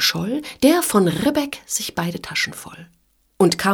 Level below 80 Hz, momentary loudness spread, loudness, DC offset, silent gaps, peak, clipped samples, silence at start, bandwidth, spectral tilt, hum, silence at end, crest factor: -54 dBFS; 9 LU; -20 LUFS; under 0.1%; none; -2 dBFS; under 0.1%; 0 s; over 20 kHz; -4 dB/octave; none; 0 s; 18 dB